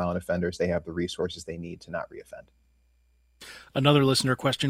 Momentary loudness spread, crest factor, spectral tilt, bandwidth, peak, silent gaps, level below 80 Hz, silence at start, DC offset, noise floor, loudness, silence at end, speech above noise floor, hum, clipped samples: 24 LU; 22 dB; -5 dB/octave; 16 kHz; -6 dBFS; none; -54 dBFS; 0 s; under 0.1%; -65 dBFS; -27 LUFS; 0 s; 38 dB; none; under 0.1%